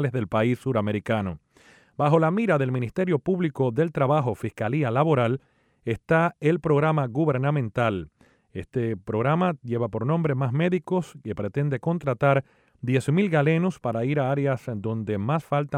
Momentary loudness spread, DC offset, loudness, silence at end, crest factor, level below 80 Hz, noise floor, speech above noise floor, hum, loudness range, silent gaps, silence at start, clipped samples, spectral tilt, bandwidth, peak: 9 LU; under 0.1%; -25 LUFS; 0 s; 16 dB; -58 dBFS; -56 dBFS; 32 dB; none; 2 LU; none; 0 s; under 0.1%; -8.5 dB/octave; 10.5 kHz; -8 dBFS